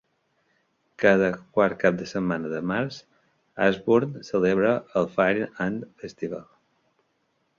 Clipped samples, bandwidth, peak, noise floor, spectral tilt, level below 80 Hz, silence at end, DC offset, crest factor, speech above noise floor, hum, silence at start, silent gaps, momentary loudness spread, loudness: under 0.1%; 7.2 kHz; -4 dBFS; -72 dBFS; -7 dB/octave; -60 dBFS; 1.15 s; under 0.1%; 22 dB; 48 dB; none; 1 s; none; 14 LU; -24 LUFS